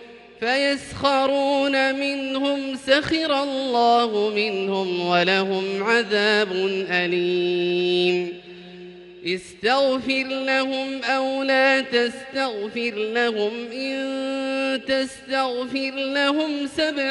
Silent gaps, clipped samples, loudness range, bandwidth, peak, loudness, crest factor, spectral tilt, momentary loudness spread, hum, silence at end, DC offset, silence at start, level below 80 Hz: none; under 0.1%; 4 LU; 11.5 kHz; -4 dBFS; -22 LUFS; 18 dB; -4.5 dB/octave; 8 LU; none; 0 s; under 0.1%; 0 s; -60 dBFS